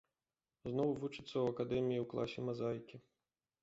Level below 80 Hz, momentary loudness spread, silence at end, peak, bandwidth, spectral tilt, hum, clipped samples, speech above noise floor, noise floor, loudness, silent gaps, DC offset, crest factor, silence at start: -70 dBFS; 8 LU; 0.65 s; -24 dBFS; 8 kHz; -6.5 dB/octave; none; under 0.1%; over 51 dB; under -90 dBFS; -40 LUFS; none; under 0.1%; 16 dB; 0.65 s